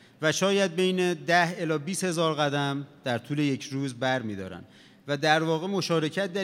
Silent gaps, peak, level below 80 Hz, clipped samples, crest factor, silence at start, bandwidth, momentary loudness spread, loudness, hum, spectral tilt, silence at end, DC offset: none; -6 dBFS; -78 dBFS; under 0.1%; 20 dB; 0.2 s; 16.5 kHz; 10 LU; -27 LUFS; none; -4.5 dB/octave; 0 s; under 0.1%